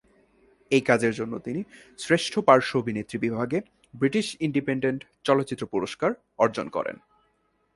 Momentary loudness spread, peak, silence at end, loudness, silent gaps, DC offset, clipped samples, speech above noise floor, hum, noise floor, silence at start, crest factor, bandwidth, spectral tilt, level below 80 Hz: 11 LU; -2 dBFS; 0.8 s; -26 LUFS; none; under 0.1%; under 0.1%; 44 dB; none; -70 dBFS; 0.7 s; 24 dB; 11.5 kHz; -5.5 dB/octave; -64 dBFS